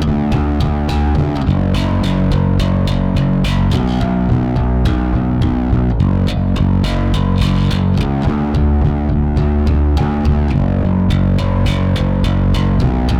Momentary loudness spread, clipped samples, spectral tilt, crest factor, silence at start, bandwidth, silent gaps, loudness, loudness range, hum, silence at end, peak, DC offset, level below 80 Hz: 2 LU; under 0.1%; -8 dB/octave; 12 dB; 0 s; 11 kHz; none; -15 LUFS; 0 LU; none; 0 s; -2 dBFS; under 0.1%; -18 dBFS